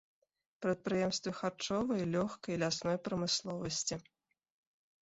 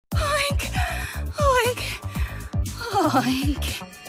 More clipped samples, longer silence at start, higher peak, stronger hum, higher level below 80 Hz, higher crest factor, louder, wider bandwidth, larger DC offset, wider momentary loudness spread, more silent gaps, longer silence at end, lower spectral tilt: neither; first, 0.6 s vs 0.1 s; second, -20 dBFS vs -8 dBFS; neither; second, -68 dBFS vs -32 dBFS; about the same, 16 dB vs 16 dB; second, -36 LUFS vs -24 LUFS; second, 8 kHz vs 16 kHz; neither; second, 5 LU vs 9 LU; neither; first, 1 s vs 0 s; about the same, -4.5 dB/octave vs -4.5 dB/octave